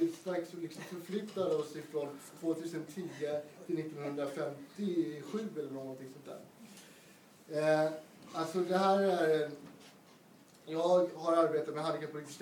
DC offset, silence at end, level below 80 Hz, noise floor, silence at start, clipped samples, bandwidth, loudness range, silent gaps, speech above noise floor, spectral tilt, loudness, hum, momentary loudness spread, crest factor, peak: under 0.1%; 0 s; -90 dBFS; -60 dBFS; 0 s; under 0.1%; 19 kHz; 7 LU; none; 25 dB; -6 dB/octave; -35 LUFS; none; 18 LU; 18 dB; -18 dBFS